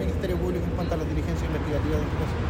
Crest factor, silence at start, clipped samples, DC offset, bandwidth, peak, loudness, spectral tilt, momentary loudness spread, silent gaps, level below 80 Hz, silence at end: 12 dB; 0 s; under 0.1%; under 0.1%; 16 kHz; -14 dBFS; -27 LUFS; -7.5 dB/octave; 2 LU; none; -32 dBFS; 0 s